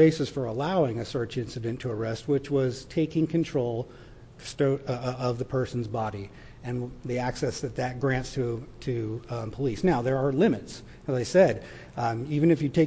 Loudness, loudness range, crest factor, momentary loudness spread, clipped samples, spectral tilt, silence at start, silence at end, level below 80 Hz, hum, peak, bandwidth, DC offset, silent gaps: -28 LUFS; 5 LU; 18 dB; 12 LU; under 0.1%; -7 dB/octave; 0 s; 0 s; -52 dBFS; none; -8 dBFS; 8 kHz; under 0.1%; none